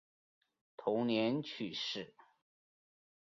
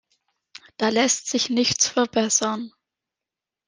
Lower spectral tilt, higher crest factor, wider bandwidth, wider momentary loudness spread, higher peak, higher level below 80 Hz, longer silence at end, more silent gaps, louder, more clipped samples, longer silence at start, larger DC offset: first, -3.5 dB/octave vs -2 dB/octave; about the same, 20 dB vs 20 dB; second, 7.4 kHz vs 10.5 kHz; about the same, 10 LU vs 8 LU; second, -20 dBFS vs -6 dBFS; second, -82 dBFS vs -64 dBFS; first, 1.2 s vs 1 s; neither; second, -37 LUFS vs -21 LUFS; neither; about the same, 0.8 s vs 0.8 s; neither